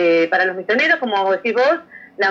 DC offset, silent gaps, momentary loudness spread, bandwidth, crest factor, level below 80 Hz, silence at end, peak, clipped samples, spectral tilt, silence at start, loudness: under 0.1%; none; 4 LU; 7.4 kHz; 12 dB; -72 dBFS; 0 s; -4 dBFS; under 0.1%; -4.5 dB/octave; 0 s; -17 LUFS